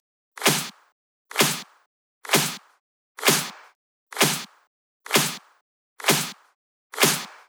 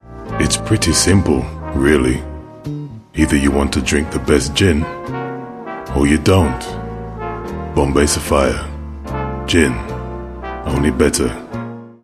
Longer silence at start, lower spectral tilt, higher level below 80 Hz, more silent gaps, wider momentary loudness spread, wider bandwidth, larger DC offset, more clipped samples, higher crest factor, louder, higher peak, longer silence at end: first, 0.35 s vs 0.05 s; second, -2 dB/octave vs -5 dB/octave; second, under -90 dBFS vs -28 dBFS; first, 0.92-1.25 s, 1.86-2.21 s, 2.80-3.15 s, 3.75-4.07 s, 4.67-5.00 s, 5.61-5.96 s, 6.55-6.90 s vs none; first, 18 LU vs 15 LU; first, over 20 kHz vs 14 kHz; neither; neither; first, 24 dB vs 16 dB; second, -22 LUFS vs -16 LUFS; about the same, -2 dBFS vs 0 dBFS; about the same, 0.15 s vs 0.1 s